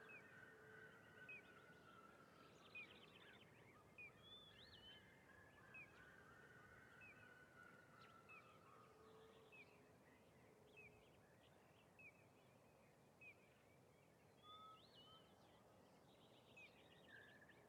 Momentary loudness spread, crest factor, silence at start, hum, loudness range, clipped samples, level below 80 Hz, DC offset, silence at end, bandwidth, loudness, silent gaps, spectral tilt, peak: 7 LU; 18 dB; 0 s; none; 6 LU; under 0.1%; -90 dBFS; under 0.1%; 0 s; 13 kHz; -65 LUFS; none; -4 dB/octave; -48 dBFS